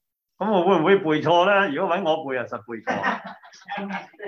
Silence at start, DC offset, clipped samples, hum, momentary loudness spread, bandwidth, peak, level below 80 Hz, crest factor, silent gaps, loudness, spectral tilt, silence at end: 0.4 s; under 0.1%; under 0.1%; none; 15 LU; 6.8 kHz; -6 dBFS; -70 dBFS; 18 dB; none; -22 LUFS; -6 dB/octave; 0 s